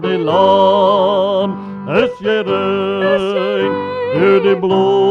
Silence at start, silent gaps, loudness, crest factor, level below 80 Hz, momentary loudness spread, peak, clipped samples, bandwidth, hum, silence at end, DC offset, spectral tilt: 0 s; none; -14 LUFS; 12 dB; -56 dBFS; 7 LU; 0 dBFS; under 0.1%; 7 kHz; none; 0 s; under 0.1%; -7 dB/octave